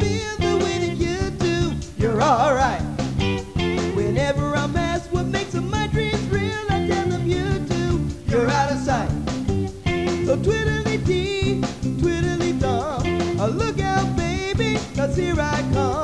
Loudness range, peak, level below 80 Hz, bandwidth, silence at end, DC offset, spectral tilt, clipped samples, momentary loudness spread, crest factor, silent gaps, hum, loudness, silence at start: 1 LU; -6 dBFS; -34 dBFS; 11 kHz; 0 s; 0.4%; -6 dB/octave; under 0.1%; 4 LU; 16 dB; none; none; -22 LUFS; 0 s